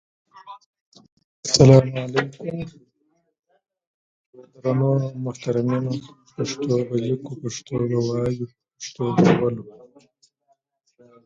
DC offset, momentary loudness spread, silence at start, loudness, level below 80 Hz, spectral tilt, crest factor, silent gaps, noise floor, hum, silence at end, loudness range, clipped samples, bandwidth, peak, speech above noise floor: under 0.1%; 19 LU; 0.35 s; -21 LUFS; -54 dBFS; -6 dB/octave; 22 dB; 0.66-0.74 s, 0.81-0.92 s, 1.12-1.17 s, 1.24-1.43 s, 3.39-3.43 s, 3.87-4.33 s; -69 dBFS; none; 1.55 s; 6 LU; under 0.1%; 9.2 kHz; 0 dBFS; 48 dB